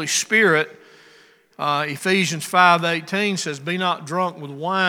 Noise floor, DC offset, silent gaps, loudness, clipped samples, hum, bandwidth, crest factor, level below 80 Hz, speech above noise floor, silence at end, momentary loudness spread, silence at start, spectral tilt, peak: -52 dBFS; under 0.1%; none; -20 LUFS; under 0.1%; none; 18.5 kHz; 20 dB; -78 dBFS; 32 dB; 0 s; 10 LU; 0 s; -3 dB/octave; 0 dBFS